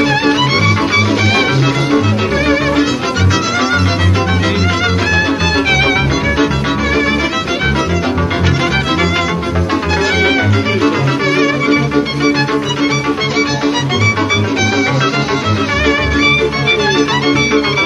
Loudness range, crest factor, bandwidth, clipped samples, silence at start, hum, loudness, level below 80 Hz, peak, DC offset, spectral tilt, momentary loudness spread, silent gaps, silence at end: 1 LU; 12 dB; 11.5 kHz; under 0.1%; 0 s; none; -12 LUFS; -30 dBFS; 0 dBFS; under 0.1%; -5 dB/octave; 4 LU; none; 0 s